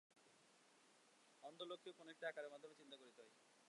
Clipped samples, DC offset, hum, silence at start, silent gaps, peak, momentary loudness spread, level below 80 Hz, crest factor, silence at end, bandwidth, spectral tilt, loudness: under 0.1%; under 0.1%; none; 0.1 s; none; -36 dBFS; 15 LU; under -90 dBFS; 24 dB; 0 s; 11 kHz; -2.5 dB/octave; -56 LUFS